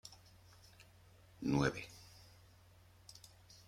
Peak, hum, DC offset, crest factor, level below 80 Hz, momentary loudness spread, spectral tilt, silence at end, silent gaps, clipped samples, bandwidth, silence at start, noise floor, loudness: -18 dBFS; none; under 0.1%; 26 dB; -64 dBFS; 27 LU; -6 dB/octave; 0.15 s; none; under 0.1%; 16 kHz; 0.05 s; -64 dBFS; -39 LUFS